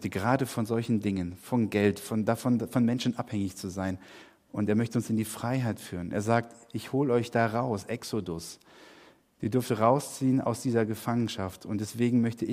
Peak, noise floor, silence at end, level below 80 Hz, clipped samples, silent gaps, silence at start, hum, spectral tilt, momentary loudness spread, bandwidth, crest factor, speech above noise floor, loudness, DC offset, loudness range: -10 dBFS; -57 dBFS; 0 s; -66 dBFS; under 0.1%; none; 0 s; none; -6.5 dB/octave; 9 LU; 15.5 kHz; 20 dB; 28 dB; -29 LUFS; under 0.1%; 3 LU